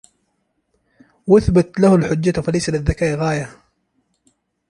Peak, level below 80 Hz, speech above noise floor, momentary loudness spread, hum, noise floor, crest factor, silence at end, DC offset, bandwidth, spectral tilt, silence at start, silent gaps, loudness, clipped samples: -2 dBFS; -36 dBFS; 53 dB; 10 LU; none; -69 dBFS; 18 dB; 1.2 s; under 0.1%; 11.5 kHz; -7 dB/octave; 1.25 s; none; -17 LUFS; under 0.1%